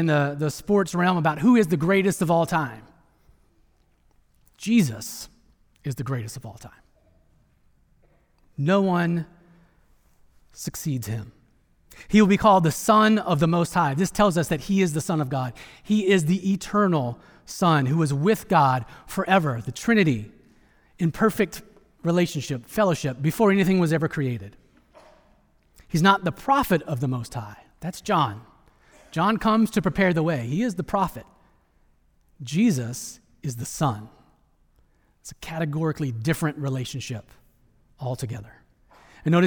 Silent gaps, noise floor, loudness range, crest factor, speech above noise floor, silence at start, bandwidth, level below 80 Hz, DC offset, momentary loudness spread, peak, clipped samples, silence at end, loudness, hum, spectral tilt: none; -62 dBFS; 8 LU; 20 dB; 39 dB; 0 s; over 20 kHz; -52 dBFS; under 0.1%; 16 LU; -4 dBFS; under 0.1%; 0 s; -23 LUFS; none; -6 dB/octave